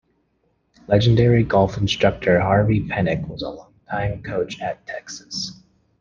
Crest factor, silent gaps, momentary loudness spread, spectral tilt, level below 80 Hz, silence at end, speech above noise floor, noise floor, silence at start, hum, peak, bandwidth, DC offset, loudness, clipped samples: 18 dB; none; 15 LU; -6.5 dB/octave; -42 dBFS; 0.45 s; 47 dB; -67 dBFS; 0.9 s; none; -2 dBFS; 7.4 kHz; under 0.1%; -20 LUFS; under 0.1%